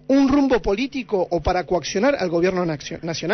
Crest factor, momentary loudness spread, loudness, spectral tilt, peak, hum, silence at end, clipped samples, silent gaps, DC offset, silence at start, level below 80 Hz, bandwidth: 12 dB; 9 LU; -21 LUFS; -5.5 dB/octave; -8 dBFS; none; 0 s; under 0.1%; none; under 0.1%; 0.1 s; -38 dBFS; 6.4 kHz